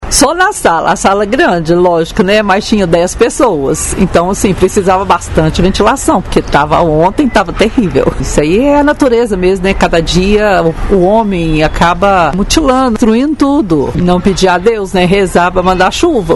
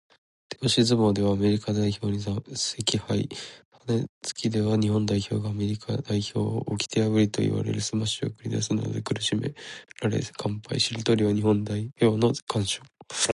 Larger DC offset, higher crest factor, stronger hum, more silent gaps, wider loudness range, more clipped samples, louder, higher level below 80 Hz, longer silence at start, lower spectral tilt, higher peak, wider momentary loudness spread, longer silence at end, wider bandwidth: first, 0.5% vs under 0.1%; second, 8 dB vs 18 dB; neither; second, none vs 3.65-3.72 s, 4.09-4.21 s, 12.42-12.47 s; about the same, 1 LU vs 3 LU; first, 1% vs under 0.1%; first, -9 LUFS vs -26 LUFS; first, -22 dBFS vs -54 dBFS; second, 0 s vs 0.5 s; about the same, -5 dB/octave vs -5 dB/octave; first, 0 dBFS vs -8 dBFS; second, 3 LU vs 9 LU; about the same, 0 s vs 0 s; about the same, 12 kHz vs 11.5 kHz